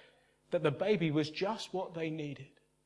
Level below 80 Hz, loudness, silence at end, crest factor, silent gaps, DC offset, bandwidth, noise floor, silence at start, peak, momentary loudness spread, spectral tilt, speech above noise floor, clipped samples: -74 dBFS; -35 LUFS; 0.4 s; 20 dB; none; under 0.1%; 11 kHz; -66 dBFS; 0.5 s; -16 dBFS; 10 LU; -6.5 dB/octave; 31 dB; under 0.1%